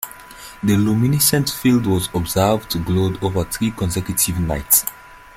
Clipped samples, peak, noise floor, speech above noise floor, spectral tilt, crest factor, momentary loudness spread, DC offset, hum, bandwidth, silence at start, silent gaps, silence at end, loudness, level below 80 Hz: under 0.1%; 0 dBFS; -38 dBFS; 20 dB; -4.5 dB/octave; 18 dB; 8 LU; under 0.1%; none; 16.5 kHz; 0 s; none; 0.2 s; -18 LUFS; -40 dBFS